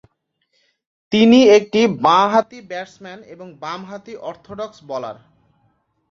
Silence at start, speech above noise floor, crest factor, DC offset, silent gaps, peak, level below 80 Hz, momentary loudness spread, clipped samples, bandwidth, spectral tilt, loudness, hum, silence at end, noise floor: 1.1 s; 52 dB; 16 dB; under 0.1%; none; -2 dBFS; -60 dBFS; 24 LU; under 0.1%; 7.4 kHz; -5 dB/octave; -14 LUFS; none; 1 s; -69 dBFS